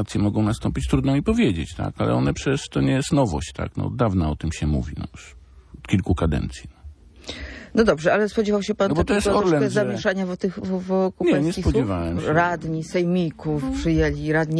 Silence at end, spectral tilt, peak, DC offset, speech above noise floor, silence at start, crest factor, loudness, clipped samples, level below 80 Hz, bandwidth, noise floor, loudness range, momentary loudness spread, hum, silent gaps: 0 s; -6.5 dB/octave; -6 dBFS; under 0.1%; 22 dB; 0 s; 16 dB; -22 LUFS; under 0.1%; -36 dBFS; 11 kHz; -44 dBFS; 4 LU; 9 LU; none; none